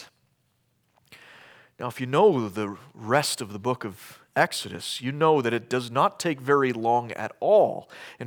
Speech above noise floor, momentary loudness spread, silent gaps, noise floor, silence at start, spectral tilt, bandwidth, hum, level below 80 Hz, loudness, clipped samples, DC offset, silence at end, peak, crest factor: 45 dB; 15 LU; none; -70 dBFS; 0 s; -4.5 dB/octave; 20 kHz; none; -76 dBFS; -25 LUFS; under 0.1%; under 0.1%; 0 s; -4 dBFS; 22 dB